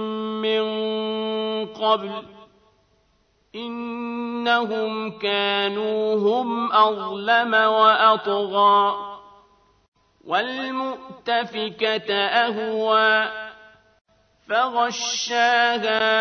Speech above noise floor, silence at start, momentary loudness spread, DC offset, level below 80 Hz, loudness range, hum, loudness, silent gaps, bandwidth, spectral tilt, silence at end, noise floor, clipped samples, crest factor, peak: 43 dB; 0 s; 13 LU; under 0.1%; -70 dBFS; 8 LU; none; -21 LUFS; 9.88-9.92 s, 14.01-14.05 s; 6.6 kHz; -3 dB/octave; 0 s; -64 dBFS; under 0.1%; 18 dB; -4 dBFS